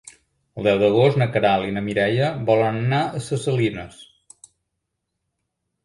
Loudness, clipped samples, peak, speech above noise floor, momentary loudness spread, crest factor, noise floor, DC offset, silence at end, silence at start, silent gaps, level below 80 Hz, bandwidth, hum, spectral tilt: -20 LUFS; under 0.1%; -4 dBFS; 59 dB; 8 LU; 18 dB; -78 dBFS; under 0.1%; 1.8 s; 0.55 s; none; -54 dBFS; 11.5 kHz; none; -6.5 dB/octave